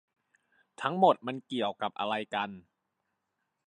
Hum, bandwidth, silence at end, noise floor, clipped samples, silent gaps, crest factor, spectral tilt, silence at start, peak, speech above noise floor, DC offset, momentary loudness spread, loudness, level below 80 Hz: none; 10 kHz; 1.05 s; -83 dBFS; under 0.1%; none; 22 dB; -6 dB/octave; 0.8 s; -10 dBFS; 53 dB; under 0.1%; 11 LU; -31 LUFS; -80 dBFS